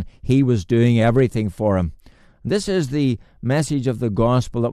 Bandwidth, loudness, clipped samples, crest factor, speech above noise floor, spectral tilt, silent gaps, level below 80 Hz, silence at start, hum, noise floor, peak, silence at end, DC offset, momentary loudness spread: 13 kHz; -20 LUFS; under 0.1%; 14 dB; 23 dB; -7 dB/octave; none; -40 dBFS; 0 s; none; -41 dBFS; -4 dBFS; 0 s; under 0.1%; 7 LU